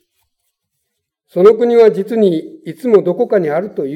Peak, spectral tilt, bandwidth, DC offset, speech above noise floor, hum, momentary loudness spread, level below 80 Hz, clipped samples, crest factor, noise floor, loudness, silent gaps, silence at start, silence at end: 0 dBFS; -8 dB/octave; 10.5 kHz; under 0.1%; 61 dB; none; 13 LU; -66 dBFS; under 0.1%; 14 dB; -73 dBFS; -13 LUFS; none; 1.35 s; 0 s